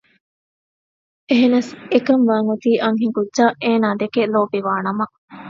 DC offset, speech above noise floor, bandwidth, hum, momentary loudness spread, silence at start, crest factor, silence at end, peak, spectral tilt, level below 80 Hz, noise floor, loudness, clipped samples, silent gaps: under 0.1%; over 73 dB; 7.6 kHz; none; 6 LU; 1.3 s; 18 dB; 0 s; 0 dBFS; -5.5 dB/octave; -66 dBFS; under -90 dBFS; -18 LUFS; under 0.1%; 5.18-5.28 s